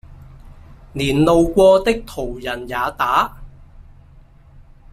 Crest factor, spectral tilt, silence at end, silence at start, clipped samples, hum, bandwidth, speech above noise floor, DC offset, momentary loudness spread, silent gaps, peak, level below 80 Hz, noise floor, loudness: 16 dB; -6 dB/octave; 0.35 s; 0.1 s; under 0.1%; none; 15 kHz; 29 dB; under 0.1%; 14 LU; none; -2 dBFS; -38 dBFS; -45 dBFS; -17 LUFS